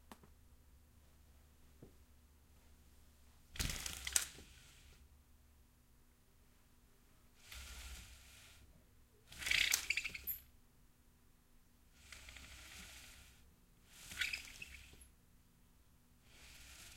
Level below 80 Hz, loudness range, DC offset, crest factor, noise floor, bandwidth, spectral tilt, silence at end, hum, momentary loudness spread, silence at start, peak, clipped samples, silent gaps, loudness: -62 dBFS; 18 LU; under 0.1%; 38 dB; -68 dBFS; 16.5 kHz; 0 dB/octave; 0 s; none; 28 LU; 0 s; -10 dBFS; under 0.1%; none; -41 LUFS